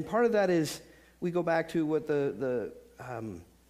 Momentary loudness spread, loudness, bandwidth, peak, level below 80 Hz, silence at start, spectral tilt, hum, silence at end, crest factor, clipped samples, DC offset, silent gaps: 16 LU; -30 LUFS; 15.5 kHz; -16 dBFS; -64 dBFS; 0 s; -6 dB/octave; none; 0.25 s; 16 dB; under 0.1%; under 0.1%; none